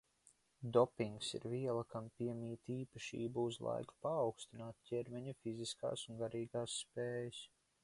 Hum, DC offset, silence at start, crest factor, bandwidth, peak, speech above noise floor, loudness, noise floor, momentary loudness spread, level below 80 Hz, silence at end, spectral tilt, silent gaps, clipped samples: none; under 0.1%; 0.6 s; 24 dB; 11.5 kHz; -18 dBFS; 31 dB; -43 LUFS; -73 dBFS; 11 LU; -76 dBFS; 0.35 s; -5 dB/octave; none; under 0.1%